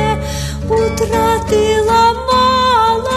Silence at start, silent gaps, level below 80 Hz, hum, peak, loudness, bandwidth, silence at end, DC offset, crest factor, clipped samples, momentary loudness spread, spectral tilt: 0 s; none; -28 dBFS; none; -2 dBFS; -13 LUFS; 13.5 kHz; 0 s; under 0.1%; 12 dB; under 0.1%; 7 LU; -4.5 dB/octave